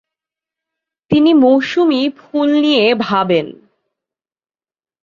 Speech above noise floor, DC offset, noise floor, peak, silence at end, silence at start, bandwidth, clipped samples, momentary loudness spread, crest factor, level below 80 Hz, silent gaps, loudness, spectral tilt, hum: over 77 dB; under 0.1%; under -90 dBFS; -2 dBFS; 1.5 s; 1.1 s; 7.2 kHz; under 0.1%; 8 LU; 14 dB; -56 dBFS; none; -13 LUFS; -6.5 dB/octave; none